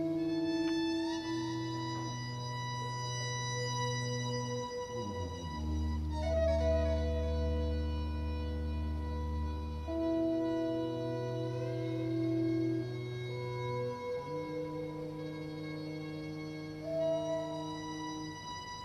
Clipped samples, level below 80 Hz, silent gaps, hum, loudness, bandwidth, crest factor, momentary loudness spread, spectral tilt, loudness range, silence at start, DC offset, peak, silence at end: under 0.1%; -42 dBFS; none; none; -36 LUFS; 12.5 kHz; 14 dB; 9 LU; -6 dB/octave; 5 LU; 0 s; under 0.1%; -20 dBFS; 0 s